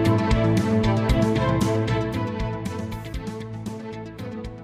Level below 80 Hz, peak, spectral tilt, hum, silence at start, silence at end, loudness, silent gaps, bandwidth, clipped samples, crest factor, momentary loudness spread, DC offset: -34 dBFS; -8 dBFS; -7 dB/octave; none; 0 s; 0 s; -24 LUFS; none; 15 kHz; under 0.1%; 14 dB; 14 LU; under 0.1%